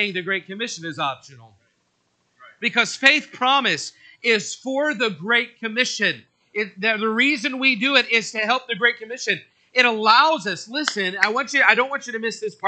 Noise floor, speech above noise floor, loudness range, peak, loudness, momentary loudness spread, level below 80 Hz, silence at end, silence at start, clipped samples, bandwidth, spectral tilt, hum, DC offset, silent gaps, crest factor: -68 dBFS; 47 dB; 4 LU; 0 dBFS; -20 LUFS; 11 LU; -80 dBFS; 0 s; 0 s; under 0.1%; 9.2 kHz; -2.5 dB/octave; none; under 0.1%; none; 22 dB